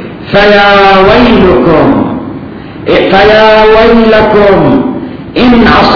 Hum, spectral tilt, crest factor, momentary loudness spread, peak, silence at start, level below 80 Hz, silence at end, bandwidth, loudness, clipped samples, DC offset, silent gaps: none; -7 dB/octave; 4 dB; 14 LU; 0 dBFS; 0 s; -24 dBFS; 0 s; 5.4 kHz; -4 LUFS; 10%; under 0.1%; none